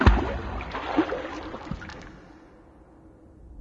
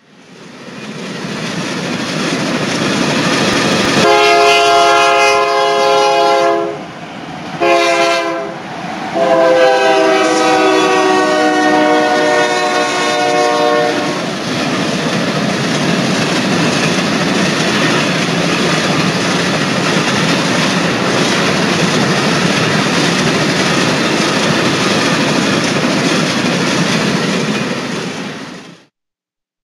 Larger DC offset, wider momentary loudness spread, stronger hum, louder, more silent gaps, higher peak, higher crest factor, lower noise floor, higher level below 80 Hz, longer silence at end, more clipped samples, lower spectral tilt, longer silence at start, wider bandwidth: neither; first, 23 LU vs 11 LU; neither; second, -30 LUFS vs -12 LUFS; neither; second, -4 dBFS vs 0 dBFS; first, 24 dB vs 14 dB; second, -52 dBFS vs -83 dBFS; first, -32 dBFS vs -50 dBFS; second, 0 s vs 0.95 s; neither; first, -7.5 dB/octave vs -4 dB/octave; second, 0 s vs 0.3 s; second, 7.4 kHz vs 14.5 kHz